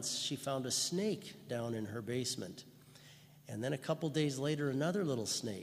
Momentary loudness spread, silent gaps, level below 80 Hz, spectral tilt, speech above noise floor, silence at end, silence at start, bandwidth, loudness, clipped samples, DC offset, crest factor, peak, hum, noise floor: 14 LU; none; -78 dBFS; -4 dB/octave; 22 dB; 0 s; 0 s; 15.5 kHz; -37 LUFS; under 0.1%; under 0.1%; 18 dB; -20 dBFS; none; -60 dBFS